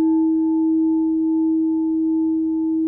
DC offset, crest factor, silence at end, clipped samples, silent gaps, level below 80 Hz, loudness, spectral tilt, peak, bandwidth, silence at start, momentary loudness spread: under 0.1%; 6 dB; 0 s; under 0.1%; none; -58 dBFS; -19 LUFS; -12.5 dB/octave; -12 dBFS; 0.9 kHz; 0 s; 2 LU